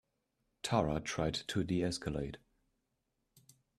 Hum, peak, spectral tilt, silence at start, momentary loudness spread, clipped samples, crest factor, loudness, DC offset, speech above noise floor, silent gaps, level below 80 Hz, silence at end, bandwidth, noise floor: none; -16 dBFS; -5 dB/octave; 0.65 s; 11 LU; under 0.1%; 24 dB; -36 LUFS; under 0.1%; 48 dB; none; -56 dBFS; 1.4 s; 14.5 kHz; -83 dBFS